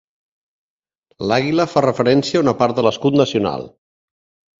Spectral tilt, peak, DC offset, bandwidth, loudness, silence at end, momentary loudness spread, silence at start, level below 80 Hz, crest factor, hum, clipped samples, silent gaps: -6 dB/octave; 0 dBFS; under 0.1%; 7.8 kHz; -17 LUFS; 0.9 s; 9 LU; 1.2 s; -54 dBFS; 18 dB; none; under 0.1%; none